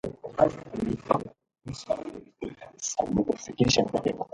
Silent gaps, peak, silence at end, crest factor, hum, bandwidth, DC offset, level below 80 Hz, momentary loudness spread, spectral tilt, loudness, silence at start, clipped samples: none; -6 dBFS; 0.1 s; 24 dB; none; 11 kHz; under 0.1%; -52 dBFS; 17 LU; -4.5 dB/octave; -28 LUFS; 0.05 s; under 0.1%